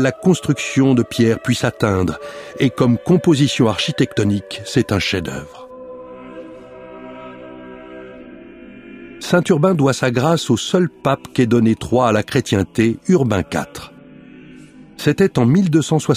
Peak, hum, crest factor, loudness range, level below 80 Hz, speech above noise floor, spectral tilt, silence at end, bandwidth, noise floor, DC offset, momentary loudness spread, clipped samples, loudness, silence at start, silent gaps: -2 dBFS; none; 16 dB; 11 LU; -48 dBFS; 25 dB; -6 dB/octave; 0 s; 15.5 kHz; -41 dBFS; under 0.1%; 21 LU; under 0.1%; -17 LUFS; 0 s; none